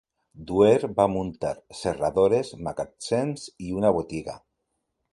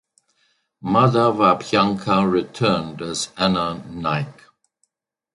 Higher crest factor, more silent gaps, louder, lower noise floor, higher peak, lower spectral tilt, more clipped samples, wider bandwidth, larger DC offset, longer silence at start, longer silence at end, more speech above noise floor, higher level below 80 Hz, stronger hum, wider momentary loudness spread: about the same, 20 dB vs 18 dB; neither; second, -25 LUFS vs -20 LUFS; first, -78 dBFS vs -71 dBFS; second, -6 dBFS vs -2 dBFS; about the same, -6 dB/octave vs -5.5 dB/octave; neither; about the same, 11.5 kHz vs 11.5 kHz; neither; second, 0.35 s vs 0.85 s; second, 0.75 s vs 1.05 s; about the same, 54 dB vs 51 dB; about the same, -52 dBFS vs -52 dBFS; neither; first, 14 LU vs 11 LU